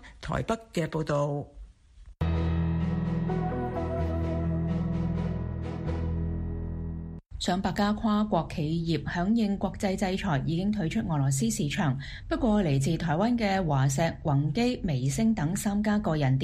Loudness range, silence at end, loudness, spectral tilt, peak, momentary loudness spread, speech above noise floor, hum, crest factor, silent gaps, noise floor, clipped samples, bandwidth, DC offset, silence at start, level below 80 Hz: 4 LU; 0 s; -29 LUFS; -6.5 dB/octave; -12 dBFS; 8 LU; 25 dB; none; 16 dB; none; -51 dBFS; under 0.1%; 15 kHz; under 0.1%; 0 s; -40 dBFS